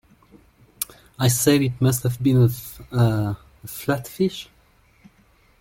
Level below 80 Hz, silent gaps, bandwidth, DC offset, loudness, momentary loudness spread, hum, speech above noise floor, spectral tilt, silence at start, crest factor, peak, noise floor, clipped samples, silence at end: -50 dBFS; none; 17 kHz; under 0.1%; -22 LUFS; 16 LU; none; 37 dB; -5.5 dB/octave; 0.8 s; 20 dB; -2 dBFS; -57 dBFS; under 0.1%; 1.15 s